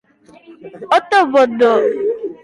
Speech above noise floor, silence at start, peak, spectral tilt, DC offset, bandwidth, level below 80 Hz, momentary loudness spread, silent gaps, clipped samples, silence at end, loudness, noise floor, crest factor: 31 dB; 0.5 s; -2 dBFS; -4 dB/octave; under 0.1%; 11.5 kHz; -62 dBFS; 9 LU; none; under 0.1%; 0.1 s; -14 LUFS; -44 dBFS; 14 dB